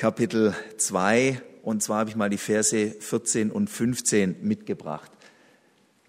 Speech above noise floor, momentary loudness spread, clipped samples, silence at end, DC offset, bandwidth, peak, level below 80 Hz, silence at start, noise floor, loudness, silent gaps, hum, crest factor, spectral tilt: 37 dB; 9 LU; under 0.1%; 1 s; under 0.1%; 16 kHz; -6 dBFS; -66 dBFS; 0 s; -62 dBFS; -25 LUFS; none; none; 20 dB; -4 dB/octave